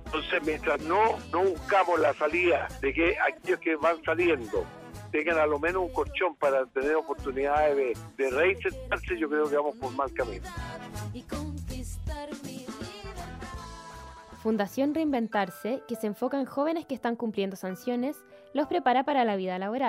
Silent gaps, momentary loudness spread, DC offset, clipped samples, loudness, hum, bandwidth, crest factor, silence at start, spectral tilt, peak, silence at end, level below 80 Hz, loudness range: none; 14 LU; under 0.1%; under 0.1%; -28 LUFS; none; 16 kHz; 16 dB; 0 s; -5.5 dB/octave; -12 dBFS; 0 s; -48 dBFS; 10 LU